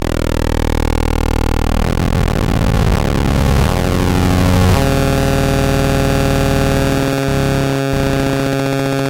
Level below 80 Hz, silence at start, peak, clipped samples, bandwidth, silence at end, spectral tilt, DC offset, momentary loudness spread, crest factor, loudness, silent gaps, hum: -20 dBFS; 0 s; -2 dBFS; under 0.1%; 17 kHz; 0 s; -6 dB/octave; under 0.1%; 4 LU; 10 dB; -15 LUFS; none; none